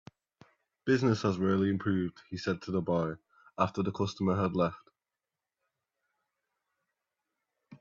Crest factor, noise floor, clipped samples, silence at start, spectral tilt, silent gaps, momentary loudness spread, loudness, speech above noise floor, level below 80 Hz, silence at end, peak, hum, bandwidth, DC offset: 20 dB; -90 dBFS; under 0.1%; 0.85 s; -7 dB/octave; none; 9 LU; -31 LUFS; 60 dB; -68 dBFS; 0.05 s; -12 dBFS; none; 7.4 kHz; under 0.1%